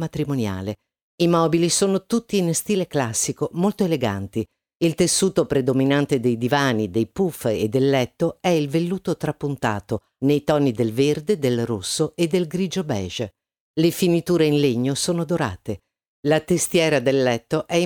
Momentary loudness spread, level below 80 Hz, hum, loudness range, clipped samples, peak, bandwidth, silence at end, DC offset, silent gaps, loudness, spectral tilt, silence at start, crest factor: 8 LU; -54 dBFS; none; 2 LU; under 0.1%; -6 dBFS; over 20 kHz; 0 s; under 0.1%; 1.03-1.18 s, 4.75-4.80 s, 13.60-13.74 s, 16.08-16.23 s; -21 LUFS; -5 dB/octave; 0 s; 14 dB